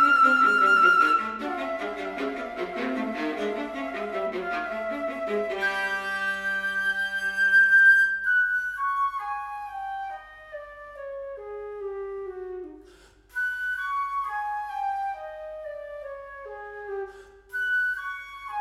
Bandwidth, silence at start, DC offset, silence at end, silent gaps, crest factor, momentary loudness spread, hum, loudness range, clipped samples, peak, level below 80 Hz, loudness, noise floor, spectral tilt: 15 kHz; 0 s; under 0.1%; 0 s; none; 18 dB; 20 LU; none; 14 LU; under 0.1%; -8 dBFS; -60 dBFS; -24 LUFS; -54 dBFS; -3 dB/octave